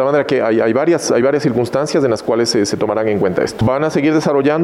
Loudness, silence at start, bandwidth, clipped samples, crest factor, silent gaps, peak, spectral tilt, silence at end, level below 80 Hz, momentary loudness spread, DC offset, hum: -15 LUFS; 0 s; 13.5 kHz; under 0.1%; 10 dB; none; -4 dBFS; -5.5 dB/octave; 0 s; -48 dBFS; 3 LU; under 0.1%; none